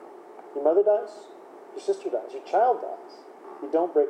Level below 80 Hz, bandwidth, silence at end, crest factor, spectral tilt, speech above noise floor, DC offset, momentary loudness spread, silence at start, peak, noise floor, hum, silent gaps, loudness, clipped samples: under -90 dBFS; 9.4 kHz; 0 s; 16 dB; -5 dB/octave; 20 dB; under 0.1%; 24 LU; 0 s; -10 dBFS; -45 dBFS; none; none; -25 LUFS; under 0.1%